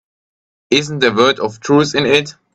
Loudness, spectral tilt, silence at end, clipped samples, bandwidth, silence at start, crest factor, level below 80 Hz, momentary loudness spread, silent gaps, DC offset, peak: -14 LUFS; -4.5 dB/octave; 0.25 s; under 0.1%; 9.4 kHz; 0.7 s; 16 dB; -54 dBFS; 4 LU; none; under 0.1%; 0 dBFS